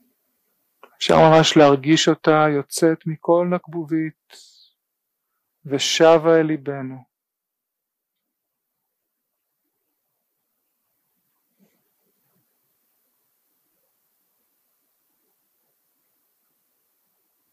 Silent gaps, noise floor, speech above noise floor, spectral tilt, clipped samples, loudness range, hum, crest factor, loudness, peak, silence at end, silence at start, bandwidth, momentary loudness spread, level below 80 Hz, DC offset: none; -83 dBFS; 66 dB; -5 dB/octave; under 0.1%; 8 LU; none; 20 dB; -17 LUFS; -2 dBFS; 10.55 s; 1 s; 14.5 kHz; 14 LU; -62 dBFS; under 0.1%